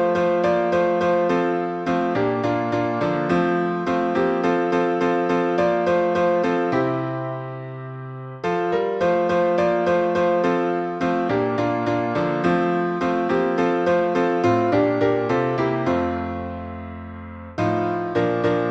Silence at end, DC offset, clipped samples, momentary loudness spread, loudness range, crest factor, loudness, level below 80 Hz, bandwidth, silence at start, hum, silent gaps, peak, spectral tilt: 0 s; under 0.1%; under 0.1%; 10 LU; 3 LU; 14 dB; -21 LUFS; -54 dBFS; 8 kHz; 0 s; none; none; -6 dBFS; -7.5 dB/octave